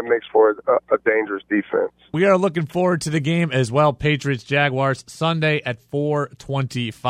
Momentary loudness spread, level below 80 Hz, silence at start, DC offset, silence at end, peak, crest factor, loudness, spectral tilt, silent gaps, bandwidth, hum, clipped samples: 8 LU; -54 dBFS; 0 s; under 0.1%; 0 s; -2 dBFS; 18 dB; -20 LUFS; -6 dB/octave; none; 13 kHz; none; under 0.1%